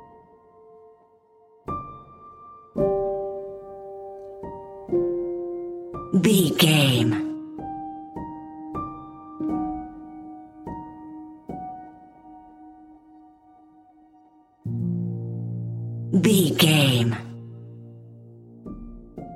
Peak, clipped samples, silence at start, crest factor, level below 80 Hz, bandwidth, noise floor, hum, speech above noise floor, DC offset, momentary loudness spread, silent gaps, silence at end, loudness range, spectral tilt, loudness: -4 dBFS; under 0.1%; 0 s; 24 dB; -54 dBFS; 16.5 kHz; -57 dBFS; none; 39 dB; under 0.1%; 24 LU; none; 0 s; 18 LU; -5 dB/octave; -24 LUFS